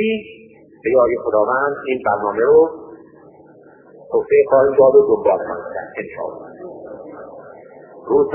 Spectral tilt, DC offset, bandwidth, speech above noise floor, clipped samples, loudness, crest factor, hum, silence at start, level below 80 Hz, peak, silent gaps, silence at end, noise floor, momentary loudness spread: -10.5 dB/octave; under 0.1%; 3.3 kHz; 30 dB; under 0.1%; -16 LUFS; 16 dB; none; 0 s; -56 dBFS; -2 dBFS; none; 0 s; -45 dBFS; 23 LU